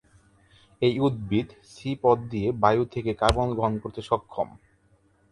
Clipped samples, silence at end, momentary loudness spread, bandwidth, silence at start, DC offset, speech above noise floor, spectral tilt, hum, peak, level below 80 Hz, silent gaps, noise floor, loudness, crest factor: under 0.1%; 0.85 s; 11 LU; 11.5 kHz; 0.8 s; under 0.1%; 38 dB; -7 dB/octave; none; -2 dBFS; -44 dBFS; none; -63 dBFS; -26 LUFS; 24 dB